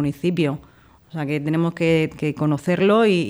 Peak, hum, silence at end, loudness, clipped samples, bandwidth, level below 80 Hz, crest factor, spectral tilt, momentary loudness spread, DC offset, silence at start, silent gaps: -6 dBFS; none; 0 s; -21 LUFS; under 0.1%; over 20 kHz; -54 dBFS; 14 dB; -7 dB/octave; 11 LU; under 0.1%; 0 s; none